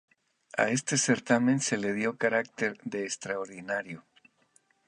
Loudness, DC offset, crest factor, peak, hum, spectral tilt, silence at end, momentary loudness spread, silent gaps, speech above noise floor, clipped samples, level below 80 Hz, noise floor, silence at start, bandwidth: -29 LUFS; under 0.1%; 22 dB; -8 dBFS; none; -4 dB/octave; 0.85 s; 10 LU; none; 39 dB; under 0.1%; -76 dBFS; -68 dBFS; 0.55 s; 11 kHz